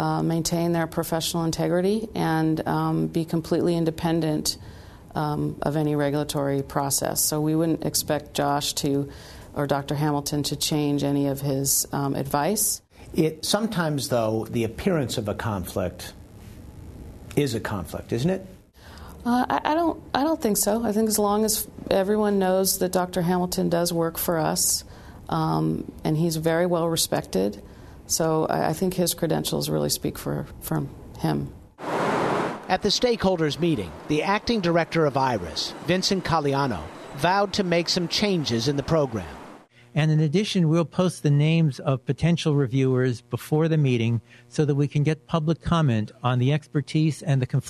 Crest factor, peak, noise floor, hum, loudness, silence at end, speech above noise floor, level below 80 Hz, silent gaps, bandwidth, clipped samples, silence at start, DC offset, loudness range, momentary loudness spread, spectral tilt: 22 dB; -2 dBFS; -47 dBFS; none; -24 LUFS; 0 s; 24 dB; -48 dBFS; none; 13.5 kHz; under 0.1%; 0 s; under 0.1%; 4 LU; 8 LU; -5 dB/octave